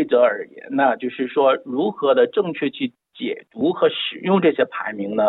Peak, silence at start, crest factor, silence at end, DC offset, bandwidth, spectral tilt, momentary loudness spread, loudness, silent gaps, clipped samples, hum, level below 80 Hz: -4 dBFS; 0 s; 16 dB; 0 s; under 0.1%; 4.1 kHz; -9.5 dB/octave; 11 LU; -20 LUFS; none; under 0.1%; none; -80 dBFS